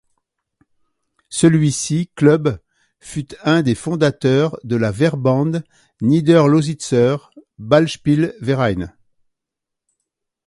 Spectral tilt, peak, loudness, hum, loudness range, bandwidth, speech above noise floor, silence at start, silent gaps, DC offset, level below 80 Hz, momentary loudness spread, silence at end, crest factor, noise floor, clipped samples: -6.5 dB/octave; 0 dBFS; -17 LUFS; none; 3 LU; 11.5 kHz; 66 dB; 1.3 s; none; under 0.1%; -48 dBFS; 13 LU; 1.55 s; 18 dB; -82 dBFS; under 0.1%